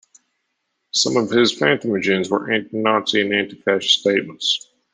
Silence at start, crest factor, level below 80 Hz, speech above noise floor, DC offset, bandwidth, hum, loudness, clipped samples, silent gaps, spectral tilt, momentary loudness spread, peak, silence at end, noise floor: 0.95 s; 18 dB; -66 dBFS; 55 dB; under 0.1%; 10 kHz; none; -18 LUFS; under 0.1%; none; -3 dB/octave; 5 LU; -2 dBFS; 0.35 s; -74 dBFS